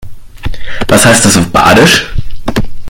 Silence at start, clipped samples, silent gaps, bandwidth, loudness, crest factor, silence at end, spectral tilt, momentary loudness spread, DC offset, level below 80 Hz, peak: 0 s; 2%; none; over 20 kHz; -6 LUFS; 8 dB; 0 s; -3.5 dB/octave; 18 LU; under 0.1%; -22 dBFS; 0 dBFS